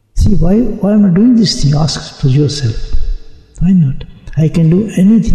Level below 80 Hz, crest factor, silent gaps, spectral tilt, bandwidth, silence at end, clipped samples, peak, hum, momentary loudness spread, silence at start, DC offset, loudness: -20 dBFS; 8 dB; none; -7 dB/octave; 10.5 kHz; 0 s; under 0.1%; -2 dBFS; none; 14 LU; 0.15 s; under 0.1%; -11 LUFS